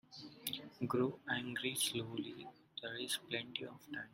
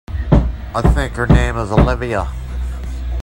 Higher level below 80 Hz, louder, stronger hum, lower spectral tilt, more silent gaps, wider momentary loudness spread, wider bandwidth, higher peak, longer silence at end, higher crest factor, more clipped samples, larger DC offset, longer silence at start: second, -78 dBFS vs -20 dBFS; second, -41 LUFS vs -17 LUFS; neither; second, -3 dB/octave vs -7.5 dB/octave; neither; about the same, 12 LU vs 11 LU; first, 16.5 kHz vs 11 kHz; second, -20 dBFS vs 0 dBFS; about the same, 0 s vs 0 s; first, 22 dB vs 16 dB; neither; neither; about the same, 0.1 s vs 0.1 s